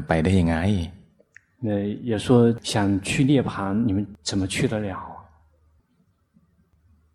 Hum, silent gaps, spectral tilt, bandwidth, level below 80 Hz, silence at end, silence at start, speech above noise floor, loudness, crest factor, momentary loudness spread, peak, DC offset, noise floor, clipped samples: none; none; -6 dB/octave; 13 kHz; -46 dBFS; 1.95 s; 0 s; 44 dB; -23 LUFS; 20 dB; 11 LU; -4 dBFS; under 0.1%; -65 dBFS; under 0.1%